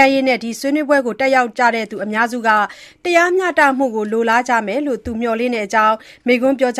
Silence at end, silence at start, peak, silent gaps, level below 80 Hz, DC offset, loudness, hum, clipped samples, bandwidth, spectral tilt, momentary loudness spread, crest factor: 0 s; 0 s; 0 dBFS; none; -52 dBFS; under 0.1%; -16 LUFS; none; under 0.1%; 15 kHz; -4 dB/octave; 7 LU; 16 dB